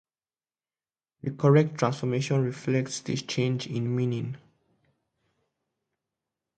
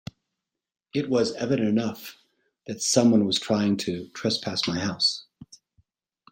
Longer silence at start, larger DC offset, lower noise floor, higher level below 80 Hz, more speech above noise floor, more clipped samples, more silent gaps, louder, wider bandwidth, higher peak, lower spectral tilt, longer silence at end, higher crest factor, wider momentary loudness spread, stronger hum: first, 1.25 s vs 0.95 s; neither; first, under -90 dBFS vs -85 dBFS; about the same, -66 dBFS vs -66 dBFS; first, over 64 dB vs 60 dB; neither; neither; second, -27 LUFS vs -24 LUFS; second, 9.2 kHz vs 16.5 kHz; about the same, -8 dBFS vs -6 dBFS; first, -6.5 dB/octave vs -4 dB/octave; first, 2.2 s vs 0.9 s; about the same, 22 dB vs 20 dB; about the same, 14 LU vs 15 LU; neither